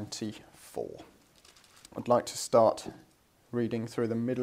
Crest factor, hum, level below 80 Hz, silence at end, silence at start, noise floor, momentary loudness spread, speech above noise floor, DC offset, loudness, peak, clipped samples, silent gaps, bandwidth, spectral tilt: 22 dB; none; -70 dBFS; 0 s; 0 s; -60 dBFS; 20 LU; 30 dB; under 0.1%; -31 LUFS; -10 dBFS; under 0.1%; none; 16 kHz; -5.5 dB/octave